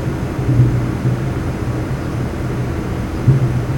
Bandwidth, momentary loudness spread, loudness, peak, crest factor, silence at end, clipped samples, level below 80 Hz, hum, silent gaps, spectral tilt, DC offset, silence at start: 17 kHz; 7 LU; -18 LUFS; 0 dBFS; 16 dB; 0 s; under 0.1%; -30 dBFS; none; none; -8 dB/octave; under 0.1%; 0 s